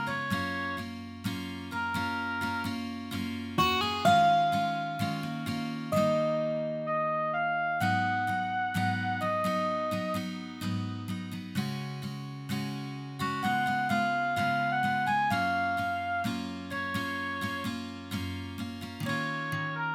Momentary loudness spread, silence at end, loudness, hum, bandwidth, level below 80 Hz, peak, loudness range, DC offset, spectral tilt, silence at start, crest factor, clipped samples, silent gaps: 10 LU; 0 s; -31 LUFS; none; 17.5 kHz; -64 dBFS; -12 dBFS; 6 LU; under 0.1%; -5.5 dB/octave; 0 s; 18 dB; under 0.1%; none